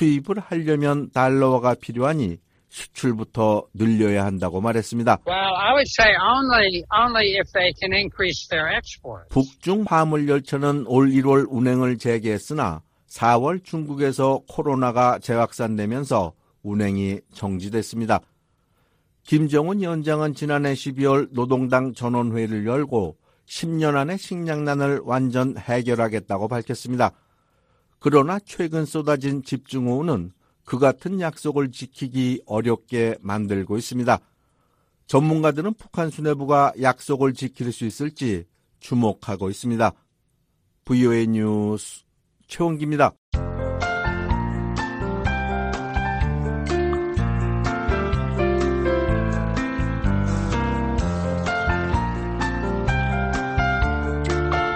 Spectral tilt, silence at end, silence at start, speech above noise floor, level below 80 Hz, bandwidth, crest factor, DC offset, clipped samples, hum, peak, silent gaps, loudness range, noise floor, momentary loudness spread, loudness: -6 dB/octave; 0 s; 0 s; 47 dB; -34 dBFS; 15 kHz; 20 dB; under 0.1%; under 0.1%; none; -2 dBFS; 43.18-43.32 s; 6 LU; -68 dBFS; 9 LU; -22 LUFS